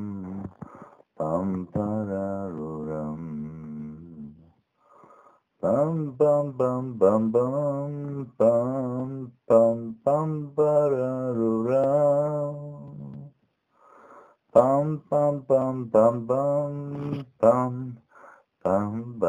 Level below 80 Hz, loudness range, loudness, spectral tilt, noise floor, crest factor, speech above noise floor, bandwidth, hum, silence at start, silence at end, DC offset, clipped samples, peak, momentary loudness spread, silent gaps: -62 dBFS; 8 LU; -25 LUFS; -10 dB/octave; -68 dBFS; 22 dB; 44 dB; 9.2 kHz; none; 0 s; 0 s; under 0.1%; under 0.1%; -4 dBFS; 18 LU; none